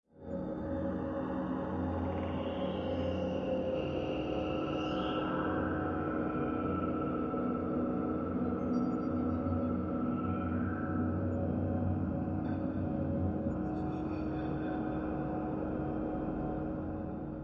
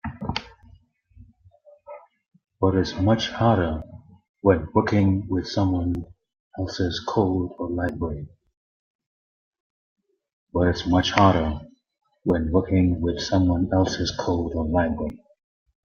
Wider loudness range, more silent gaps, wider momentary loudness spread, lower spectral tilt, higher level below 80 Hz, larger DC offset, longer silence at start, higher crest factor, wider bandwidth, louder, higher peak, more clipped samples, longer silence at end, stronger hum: second, 2 LU vs 7 LU; second, none vs 4.29-4.34 s, 6.40-6.51 s, 8.57-8.99 s, 9.06-9.52 s, 9.60-9.96 s, 10.33-10.47 s; second, 3 LU vs 13 LU; first, -9.5 dB/octave vs -6.5 dB/octave; second, -52 dBFS vs -44 dBFS; neither; about the same, 0.15 s vs 0.05 s; second, 14 dB vs 22 dB; about the same, 6.4 kHz vs 7 kHz; second, -35 LUFS vs -23 LUFS; second, -20 dBFS vs -2 dBFS; neither; second, 0 s vs 0.7 s; neither